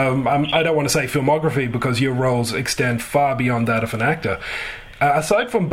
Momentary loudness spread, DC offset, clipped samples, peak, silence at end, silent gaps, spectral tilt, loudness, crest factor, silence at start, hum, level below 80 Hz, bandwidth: 5 LU; under 0.1%; under 0.1%; -4 dBFS; 0 s; none; -5 dB/octave; -19 LUFS; 16 dB; 0 s; none; -44 dBFS; 16 kHz